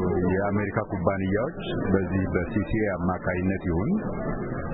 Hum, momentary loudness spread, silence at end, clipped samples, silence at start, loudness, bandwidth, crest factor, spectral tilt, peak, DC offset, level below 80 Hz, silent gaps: none; 5 LU; 0 s; under 0.1%; 0 s; -27 LUFS; 4 kHz; 18 dB; -12 dB/octave; -8 dBFS; under 0.1%; -40 dBFS; none